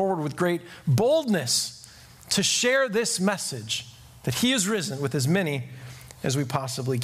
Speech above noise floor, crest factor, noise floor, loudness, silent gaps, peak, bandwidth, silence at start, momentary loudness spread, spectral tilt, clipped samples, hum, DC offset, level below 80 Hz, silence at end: 23 dB; 18 dB; -48 dBFS; -25 LUFS; none; -8 dBFS; 15.5 kHz; 0 s; 11 LU; -4 dB/octave; under 0.1%; none; under 0.1%; -60 dBFS; 0 s